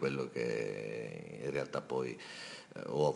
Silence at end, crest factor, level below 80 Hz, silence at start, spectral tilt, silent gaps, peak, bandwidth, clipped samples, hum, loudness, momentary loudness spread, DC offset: 0 s; 20 dB; -74 dBFS; 0 s; -6 dB/octave; none; -18 dBFS; 11.5 kHz; under 0.1%; none; -39 LUFS; 9 LU; under 0.1%